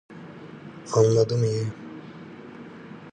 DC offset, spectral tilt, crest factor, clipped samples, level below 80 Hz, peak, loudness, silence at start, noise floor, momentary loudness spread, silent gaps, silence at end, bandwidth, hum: under 0.1%; -6.5 dB/octave; 20 dB; under 0.1%; -62 dBFS; -6 dBFS; -23 LUFS; 0.1 s; -42 dBFS; 22 LU; none; 0 s; 9.6 kHz; none